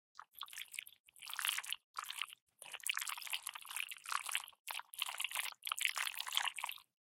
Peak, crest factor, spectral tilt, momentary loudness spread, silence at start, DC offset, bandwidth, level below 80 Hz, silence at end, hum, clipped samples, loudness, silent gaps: -16 dBFS; 30 dB; 5 dB/octave; 12 LU; 0.2 s; under 0.1%; 17 kHz; under -90 dBFS; 0.2 s; none; under 0.1%; -41 LUFS; 1.00-1.04 s, 1.84-1.94 s, 2.42-2.47 s, 4.59-4.65 s